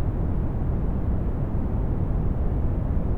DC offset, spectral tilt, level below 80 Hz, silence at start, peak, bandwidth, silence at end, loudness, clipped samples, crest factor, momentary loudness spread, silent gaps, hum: under 0.1%; -11.5 dB/octave; -26 dBFS; 0 s; -12 dBFS; 3.4 kHz; 0 s; -27 LUFS; under 0.1%; 12 dB; 1 LU; none; none